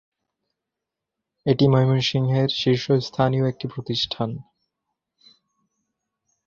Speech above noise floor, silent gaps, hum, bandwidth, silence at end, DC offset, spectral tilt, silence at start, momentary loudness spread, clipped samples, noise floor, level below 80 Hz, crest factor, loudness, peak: 64 dB; none; none; 7.2 kHz; 2.05 s; under 0.1%; -7 dB/octave; 1.45 s; 12 LU; under 0.1%; -85 dBFS; -56 dBFS; 20 dB; -22 LUFS; -4 dBFS